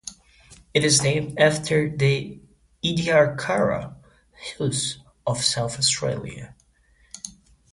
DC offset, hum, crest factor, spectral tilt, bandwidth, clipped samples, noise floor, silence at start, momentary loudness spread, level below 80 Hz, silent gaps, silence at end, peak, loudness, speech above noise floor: under 0.1%; none; 20 dB; -3.5 dB/octave; 11.5 kHz; under 0.1%; -60 dBFS; 0.05 s; 19 LU; -52 dBFS; none; 0.45 s; -4 dBFS; -22 LUFS; 38 dB